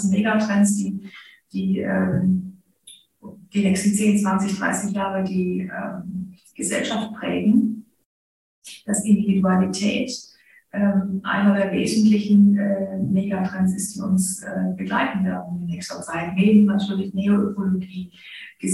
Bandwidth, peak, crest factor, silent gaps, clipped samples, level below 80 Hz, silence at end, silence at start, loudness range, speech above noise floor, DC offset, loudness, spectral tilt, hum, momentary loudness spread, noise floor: 12.5 kHz; -4 dBFS; 16 dB; 8.05-8.62 s; under 0.1%; -58 dBFS; 0 s; 0 s; 5 LU; 29 dB; under 0.1%; -21 LUFS; -5.5 dB/octave; none; 14 LU; -50 dBFS